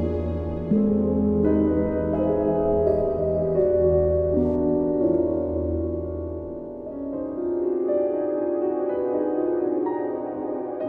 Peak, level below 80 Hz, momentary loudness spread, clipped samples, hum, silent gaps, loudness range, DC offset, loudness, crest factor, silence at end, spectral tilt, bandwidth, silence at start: -8 dBFS; -42 dBFS; 9 LU; under 0.1%; none; none; 5 LU; under 0.1%; -24 LUFS; 14 dB; 0 s; -12.5 dB/octave; 3.2 kHz; 0 s